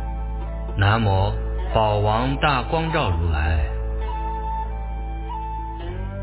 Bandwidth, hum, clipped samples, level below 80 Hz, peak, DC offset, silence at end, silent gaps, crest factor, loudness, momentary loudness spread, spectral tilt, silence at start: 4 kHz; none; under 0.1%; -26 dBFS; -4 dBFS; under 0.1%; 0 s; none; 18 dB; -23 LUFS; 11 LU; -10.5 dB/octave; 0 s